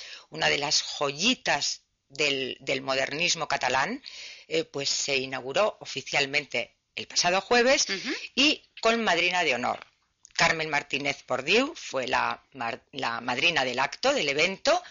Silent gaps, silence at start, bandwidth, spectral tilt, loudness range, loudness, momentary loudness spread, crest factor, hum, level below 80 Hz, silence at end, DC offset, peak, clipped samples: none; 0 s; 7.6 kHz; -0.5 dB/octave; 3 LU; -26 LUFS; 11 LU; 16 dB; none; -62 dBFS; 0 s; under 0.1%; -12 dBFS; under 0.1%